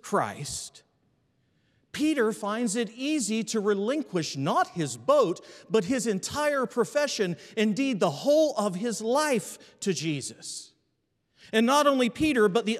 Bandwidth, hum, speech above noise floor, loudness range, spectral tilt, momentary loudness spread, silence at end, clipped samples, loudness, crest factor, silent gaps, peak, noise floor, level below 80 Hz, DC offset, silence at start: 15 kHz; none; 49 dB; 3 LU; -4 dB/octave; 11 LU; 0 s; under 0.1%; -27 LUFS; 18 dB; none; -8 dBFS; -75 dBFS; -66 dBFS; under 0.1%; 0.05 s